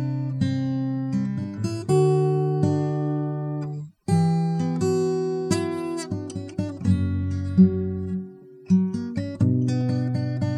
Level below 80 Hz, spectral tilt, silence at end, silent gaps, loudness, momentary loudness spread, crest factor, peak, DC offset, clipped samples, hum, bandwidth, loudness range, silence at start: -54 dBFS; -8 dB/octave; 0 s; none; -24 LUFS; 10 LU; 18 dB; -6 dBFS; under 0.1%; under 0.1%; none; 12 kHz; 2 LU; 0 s